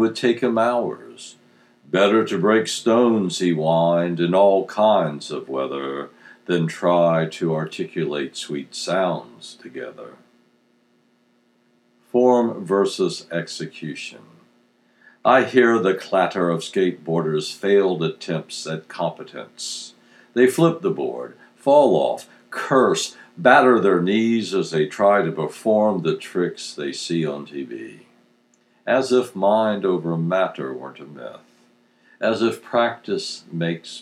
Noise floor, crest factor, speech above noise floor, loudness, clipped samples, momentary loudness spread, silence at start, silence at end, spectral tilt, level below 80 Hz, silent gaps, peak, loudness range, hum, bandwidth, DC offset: -62 dBFS; 20 dB; 42 dB; -20 LUFS; under 0.1%; 17 LU; 0 s; 0 s; -5.5 dB/octave; -82 dBFS; none; 0 dBFS; 7 LU; none; 13.5 kHz; under 0.1%